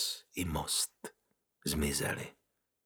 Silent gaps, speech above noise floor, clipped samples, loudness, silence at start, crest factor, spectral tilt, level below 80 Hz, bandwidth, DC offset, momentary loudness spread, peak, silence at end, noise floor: none; 44 dB; under 0.1%; -35 LUFS; 0 s; 18 dB; -3 dB/octave; -50 dBFS; over 20 kHz; under 0.1%; 16 LU; -20 dBFS; 0.55 s; -80 dBFS